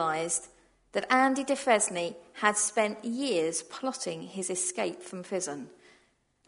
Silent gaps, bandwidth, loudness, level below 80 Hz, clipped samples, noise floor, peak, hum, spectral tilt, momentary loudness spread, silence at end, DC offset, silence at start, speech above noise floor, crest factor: none; 11 kHz; -29 LUFS; -74 dBFS; under 0.1%; -68 dBFS; -8 dBFS; none; -2.5 dB/octave; 11 LU; 0.8 s; under 0.1%; 0 s; 39 dB; 24 dB